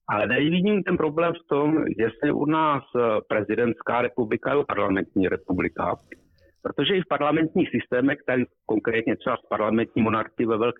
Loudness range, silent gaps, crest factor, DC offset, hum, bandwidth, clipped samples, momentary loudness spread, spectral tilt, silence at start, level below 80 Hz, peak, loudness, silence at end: 2 LU; none; 12 dB; under 0.1%; none; 4 kHz; under 0.1%; 5 LU; -9.5 dB/octave; 0.1 s; -56 dBFS; -12 dBFS; -24 LUFS; 0.05 s